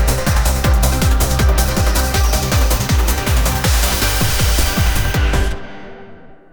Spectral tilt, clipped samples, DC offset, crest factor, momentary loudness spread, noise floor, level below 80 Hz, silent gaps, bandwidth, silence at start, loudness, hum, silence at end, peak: -4 dB/octave; under 0.1%; under 0.1%; 12 dB; 2 LU; -38 dBFS; -16 dBFS; none; over 20 kHz; 0 s; -16 LUFS; none; 0.15 s; -2 dBFS